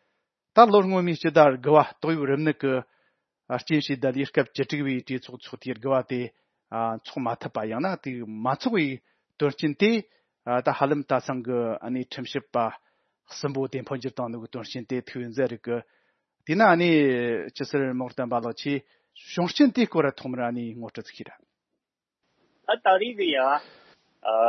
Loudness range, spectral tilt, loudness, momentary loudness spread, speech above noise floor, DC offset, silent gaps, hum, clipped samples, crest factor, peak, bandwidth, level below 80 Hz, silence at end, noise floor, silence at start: 7 LU; -6.5 dB/octave; -25 LUFS; 15 LU; 59 dB; under 0.1%; none; none; under 0.1%; 24 dB; 0 dBFS; 6.4 kHz; -74 dBFS; 0 s; -84 dBFS; 0.55 s